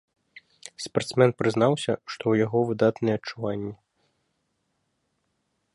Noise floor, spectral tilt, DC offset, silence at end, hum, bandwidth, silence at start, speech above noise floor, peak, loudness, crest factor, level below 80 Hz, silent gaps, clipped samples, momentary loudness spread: -75 dBFS; -6 dB/octave; under 0.1%; 2 s; none; 11.5 kHz; 0.65 s; 51 dB; -6 dBFS; -25 LUFS; 22 dB; -64 dBFS; none; under 0.1%; 15 LU